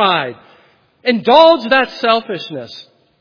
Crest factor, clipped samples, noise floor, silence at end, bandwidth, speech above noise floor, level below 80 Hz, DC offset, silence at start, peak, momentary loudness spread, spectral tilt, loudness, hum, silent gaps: 14 dB; 0.2%; -51 dBFS; 0.4 s; 5.4 kHz; 38 dB; -60 dBFS; under 0.1%; 0 s; 0 dBFS; 18 LU; -5.5 dB/octave; -13 LUFS; none; none